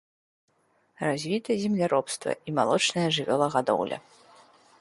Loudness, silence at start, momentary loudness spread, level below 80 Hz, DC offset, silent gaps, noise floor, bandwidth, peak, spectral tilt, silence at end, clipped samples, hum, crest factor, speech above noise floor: -26 LUFS; 1 s; 8 LU; -70 dBFS; under 0.1%; none; -67 dBFS; 11.5 kHz; -10 dBFS; -4.5 dB/octave; 0.8 s; under 0.1%; none; 20 dB; 41 dB